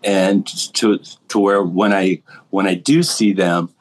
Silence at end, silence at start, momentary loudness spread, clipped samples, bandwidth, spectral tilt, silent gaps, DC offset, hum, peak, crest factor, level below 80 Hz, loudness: 0.15 s; 0.05 s; 7 LU; under 0.1%; 12.5 kHz; -4.5 dB/octave; none; under 0.1%; none; -2 dBFS; 14 dB; -76 dBFS; -17 LUFS